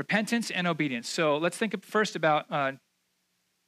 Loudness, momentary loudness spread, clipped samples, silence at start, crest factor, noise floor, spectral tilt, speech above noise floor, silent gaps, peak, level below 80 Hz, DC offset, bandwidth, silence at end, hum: -28 LUFS; 5 LU; under 0.1%; 0 s; 18 dB; -75 dBFS; -4.5 dB/octave; 47 dB; none; -12 dBFS; -86 dBFS; under 0.1%; 15 kHz; 0.9 s; none